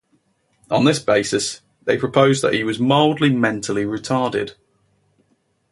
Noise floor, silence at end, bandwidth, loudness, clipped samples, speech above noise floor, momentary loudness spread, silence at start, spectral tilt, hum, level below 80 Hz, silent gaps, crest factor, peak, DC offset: -65 dBFS; 1.2 s; 11.5 kHz; -18 LUFS; under 0.1%; 47 dB; 7 LU; 0.7 s; -5 dB/octave; none; -56 dBFS; none; 18 dB; 0 dBFS; under 0.1%